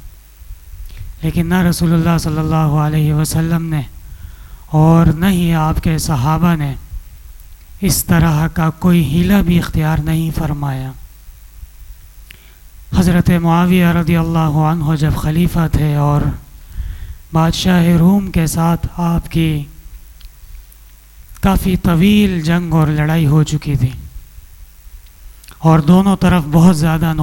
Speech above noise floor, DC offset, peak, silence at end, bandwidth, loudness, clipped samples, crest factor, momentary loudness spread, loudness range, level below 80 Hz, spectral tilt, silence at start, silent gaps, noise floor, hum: 27 dB; under 0.1%; -2 dBFS; 0 s; 16 kHz; -14 LUFS; under 0.1%; 14 dB; 14 LU; 4 LU; -28 dBFS; -6.5 dB/octave; 0 s; none; -40 dBFS; none